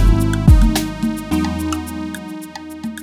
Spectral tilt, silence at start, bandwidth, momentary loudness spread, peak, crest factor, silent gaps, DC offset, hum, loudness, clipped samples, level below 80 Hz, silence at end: -6 dB/octave; 0 s; 16 kHz; 17 LU; 0 dBFS; 16 dB; none; under 0.1%; none; -17 LUFS; under 0.1%; -18 dBFS; 0 s